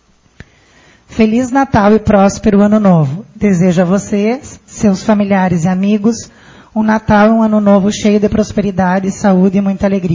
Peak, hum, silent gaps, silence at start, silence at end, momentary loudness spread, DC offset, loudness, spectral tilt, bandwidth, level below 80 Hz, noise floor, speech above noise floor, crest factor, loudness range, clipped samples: 0 dBFS; none; none; 1.1 s; 0 s; 7 LU; under 0.1%; -11 LUFS; -7 dB/octave; 7.6 kHz; -36 dBFS; -46 dBFS; 35 dB; 12 dB; 2 LU; under 0.1%